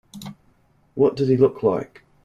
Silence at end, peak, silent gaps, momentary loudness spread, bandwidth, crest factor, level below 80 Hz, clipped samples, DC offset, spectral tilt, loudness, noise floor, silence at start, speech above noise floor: 0.4 s; -4 dBFS; none; 21 LU; 12 kHz; 18 dB; -58 dBFS; under 0.1%; under 0.1%; -8.5 dB/octave; -20 LUFS; -59 dBFS; 0.15 s; 41 dB